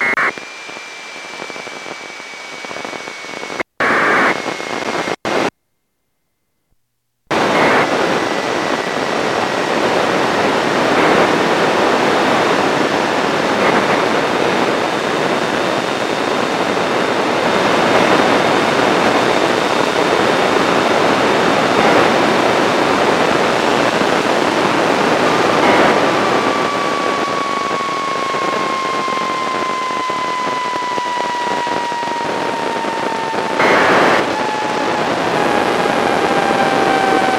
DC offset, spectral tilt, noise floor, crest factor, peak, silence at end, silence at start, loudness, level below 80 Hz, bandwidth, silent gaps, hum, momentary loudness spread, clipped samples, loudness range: under 0.1%; -4 dB/octave; -70 dBFS; 14 dB; 0 dBFS; 0 s; 0 s; -15 LUFS; -52 dBFS; 16.5 kHz; none; none; 8 LU; under 0.1%; 5 LU